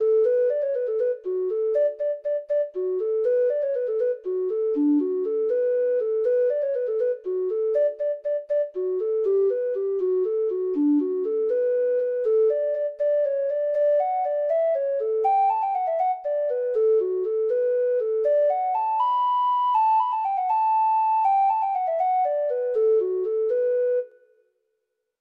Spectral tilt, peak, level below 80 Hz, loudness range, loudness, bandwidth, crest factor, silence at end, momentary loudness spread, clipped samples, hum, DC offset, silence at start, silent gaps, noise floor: -6 dB/octave; -14 dBFS; -76 dBFS; 3 LU; -23 LUFS; 4.7 kHz; 10 dB; 1.1 s; 5 LU; under 0.1%; none; under 0.1%; 0 s; none; -78 dBFS